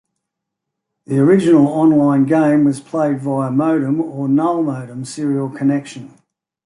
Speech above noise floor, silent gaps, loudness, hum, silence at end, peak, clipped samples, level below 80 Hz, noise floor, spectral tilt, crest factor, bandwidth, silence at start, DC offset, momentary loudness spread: 64 dB; none; -15 LUFS; none; 0.6 s; -2 dBFS; under 0.1%; -62 dBFS; -79 dBFS; -8 dB/octave; 14 dB; 11 kHz; 1.1 s; under 0.1%; 11 LU